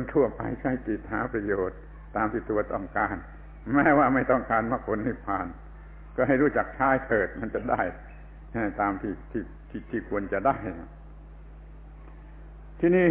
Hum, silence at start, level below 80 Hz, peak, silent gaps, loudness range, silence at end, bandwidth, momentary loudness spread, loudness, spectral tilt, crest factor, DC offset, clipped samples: none; 0 s; -44 dBFS; -10 dBFS; none; 6 LU; 0 s; 3.8 kHz; 24 LU; -27 LUFS; -11.5 dB/octave; 18 dB; under 0.1%; under 0.1%